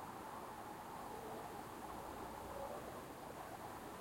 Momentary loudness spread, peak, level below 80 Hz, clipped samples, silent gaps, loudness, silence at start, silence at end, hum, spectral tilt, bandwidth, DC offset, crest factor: 2 LU; -34 dBFS; -68 dBFS; under 0.1%; none; -50 LUFS; 0 s; 0 s; none; -4.5 dB/octave; 16.5 kHz; under 0.1%; 16 dB